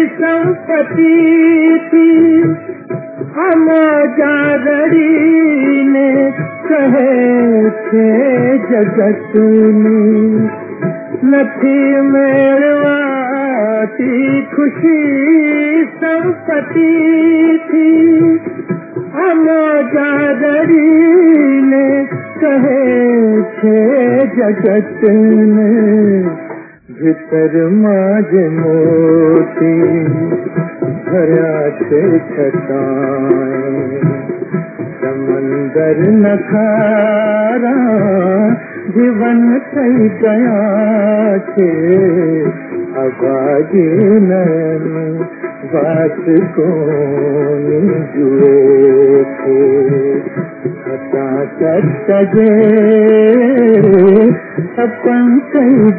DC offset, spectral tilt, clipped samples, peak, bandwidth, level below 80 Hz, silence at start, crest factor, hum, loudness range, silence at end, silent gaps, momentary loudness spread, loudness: under 0.1%; -12 dB/octave; under 0.1%; 0 dBFS; 3.6 kHz; -62 dBFS; 0 s; 10 dB; none; 4 LU; 0 s; none; 10 LU; -11 LUFS